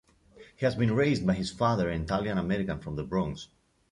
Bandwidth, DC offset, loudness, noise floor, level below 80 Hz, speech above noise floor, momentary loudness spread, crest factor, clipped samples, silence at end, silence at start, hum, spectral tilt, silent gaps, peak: 11 kHz; under 0.1%; -29 LUFS; -55 dBFS; -48 dBFS; 27 dB; 9 LU; 16 dB; under 0.1%; 0.45 s; 0.35 s; none; -7 dB/octave; none; -12 dBFS